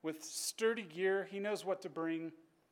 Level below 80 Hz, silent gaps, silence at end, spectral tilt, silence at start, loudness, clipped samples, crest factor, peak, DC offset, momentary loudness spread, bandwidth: under -90 dBFS; none; 0.3 s; -3 dB/octave; 0.05 s; -38 LUFS; under 0.1%; 16 dB; -24 dBFS; under 0.1%; 6 LU; 17.5 kHz